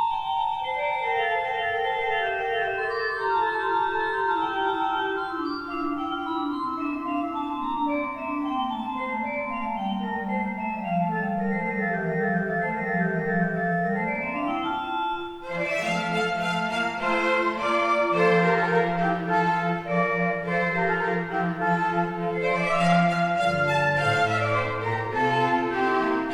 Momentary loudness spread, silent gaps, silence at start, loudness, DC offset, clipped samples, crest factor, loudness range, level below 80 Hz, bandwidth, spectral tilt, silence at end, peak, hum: 7 LU; none; 0 s; -25 LUFS; under 0.1%; under 0.1%; 16 dB; 5 LU; -56 dBFS; 11 kHz; -6 dB/octave; 0 s; -10 dBFS; none